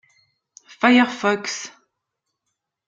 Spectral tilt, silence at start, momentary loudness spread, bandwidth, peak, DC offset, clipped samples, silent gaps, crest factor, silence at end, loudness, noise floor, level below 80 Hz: -3.5 dB/octave; 0.8 s; 15 LU; 7.8 kHz; -2 dBFS; under 0.1%; under 0.1%; none; 22 dB; 1.2 s; -19 LUFS; -80 dBFS; -72 dBFS